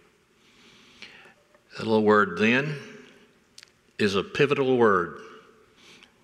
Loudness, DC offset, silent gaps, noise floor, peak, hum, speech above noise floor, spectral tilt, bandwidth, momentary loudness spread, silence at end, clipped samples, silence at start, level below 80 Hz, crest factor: -23 LUFS; under 0.1%; none; -61 dBFS; -6 dBFS; none; 38 dB; -6 dB/octave; 11 kHz; 25 LU; 0.85 s; under 0.1%; 1 s; -70 dBFS; 20 dB